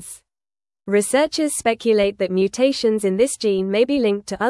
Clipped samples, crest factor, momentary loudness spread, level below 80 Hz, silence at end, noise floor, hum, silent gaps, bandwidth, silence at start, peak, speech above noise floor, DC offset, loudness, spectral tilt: under 0.1%; 14 dB; 4 LU; -54 dBFS; 0 s; under -90 dBFS; none; none; 12 kHz; 0 s; -6 dBFS; over 71 dB; under 0.1%; -19 LUFS; -4 dB/octave